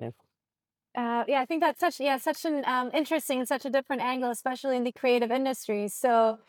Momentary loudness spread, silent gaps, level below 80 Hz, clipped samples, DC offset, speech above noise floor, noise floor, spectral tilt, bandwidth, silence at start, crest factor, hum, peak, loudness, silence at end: 6 LU; none; -90 dBFS; under 0.1%; under 0.1%; over 62 dB; under -90 dBFS; -3.5 dB/octave; 19.5 kHz; 0 s; 16 dB; none; -12 dBFS; -28 LUFS; 0.15 s